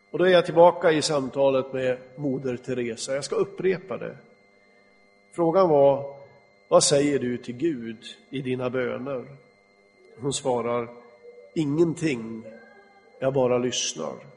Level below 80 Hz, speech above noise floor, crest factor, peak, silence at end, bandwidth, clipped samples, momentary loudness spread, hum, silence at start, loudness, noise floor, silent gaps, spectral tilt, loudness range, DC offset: -66 dBFS; 35 dB; 22 dB; -4 dBFS; 0.05 s; 10.5 kHz; under 0.1%; 16 LU; none; 0.15 s; -24 LUFS; -59 dBFS; none; -4.5 dB/octave; 7 LU; under 0.1%